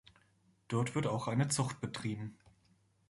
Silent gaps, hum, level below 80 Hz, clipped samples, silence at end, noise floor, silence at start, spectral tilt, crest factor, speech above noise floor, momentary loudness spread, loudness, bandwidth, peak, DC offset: none; none; -68 dBFS; under 0.1%; 0.75 s; -71 dBFS; 0.7 s; -5 dB/octave; 18 dB; 36 dB; 9 LU; -36 LUFS; 11.5 kHz; -20 dBFS; under 0.1%